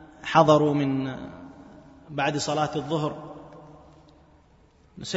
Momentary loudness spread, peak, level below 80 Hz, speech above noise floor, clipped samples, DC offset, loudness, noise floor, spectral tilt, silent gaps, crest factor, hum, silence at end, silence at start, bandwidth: 25 LU; -4 dBFS; -58 dBFS; 34 dB; under 0.1%; under 0.1%; -24 LUFS; -58 dBFS; -5.5 dB/octave; none; 22 dB; none; 0 s; 0 s; 8 kHz